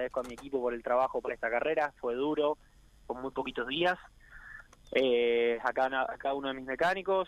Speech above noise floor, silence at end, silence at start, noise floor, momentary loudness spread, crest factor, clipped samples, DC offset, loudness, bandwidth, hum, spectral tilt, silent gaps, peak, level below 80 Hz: 20 dB; 0 s; 0 s; -51 dBFS; 12 LU; 18 dB; under 0.1%; under 0.1%; -31 LUFS; 12 kHz; none; -5 dB/octave; none; -14 dBFS; -60 dBFS